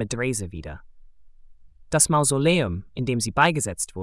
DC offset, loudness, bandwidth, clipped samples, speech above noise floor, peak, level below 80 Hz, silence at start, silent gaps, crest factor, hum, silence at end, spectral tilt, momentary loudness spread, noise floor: under 0.1%; -22 LUFS; 12 kHz; under 0.1%; 24 dB; -6 dBFS; -46 dBFS; 0 s; none; 18 dB; none; 0 s; -4 dB/octave; 13 LU; -47 dBFS